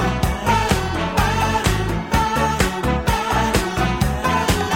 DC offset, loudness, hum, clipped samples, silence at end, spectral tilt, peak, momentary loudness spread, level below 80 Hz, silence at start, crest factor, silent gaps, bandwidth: 0.2%; -19 LUFS; none; under 0.1%; 0 s; -5 dB/octave; -2 dBFS; 3 LU; -26 dBFS; 0 s; 18 dB; none; 18 kHz